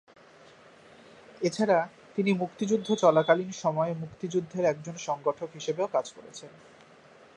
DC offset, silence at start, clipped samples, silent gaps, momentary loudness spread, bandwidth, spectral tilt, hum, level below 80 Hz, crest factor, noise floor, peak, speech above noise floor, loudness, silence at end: under 0.1%; 1.4 s; under 0.1%; none; 12 LU; 11 kHz; -5.5 dB/octave; none; -74 dBFS; 22 dB; -55 dBFS; -6 dBFS; 27 dB; -28 LUFS; 0.9 s